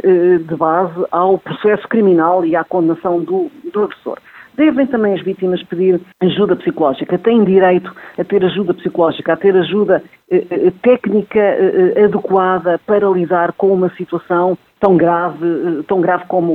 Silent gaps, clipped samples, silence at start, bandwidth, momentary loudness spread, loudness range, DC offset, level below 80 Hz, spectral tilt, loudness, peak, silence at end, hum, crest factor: none; under 0.1%; 0.05 s; 4.2 kHz; 7 LU; 3 LU; under 0.1%; -56 dBFS; -9.5 dB/octave; -14 LUFS; 0 dBFS; 0 s; none; 14 dB